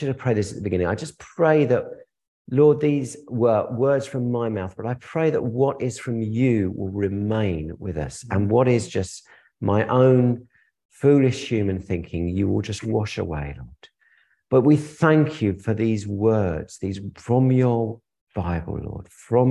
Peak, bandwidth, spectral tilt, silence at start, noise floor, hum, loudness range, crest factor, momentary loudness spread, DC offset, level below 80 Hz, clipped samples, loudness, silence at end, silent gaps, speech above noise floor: -4 dBFS; 11.5 kHz; -7.5 dB/octave; 0 s; -62 dBFS; none; 3 LU; 18 dB; 13 LU; under 0.1%; -44 dBFS; under 0.1%; -22 LUFS; 0 s; 2.28-2.45 s, 10.85-10.89 s, 18.21-18.27 s; 40 dB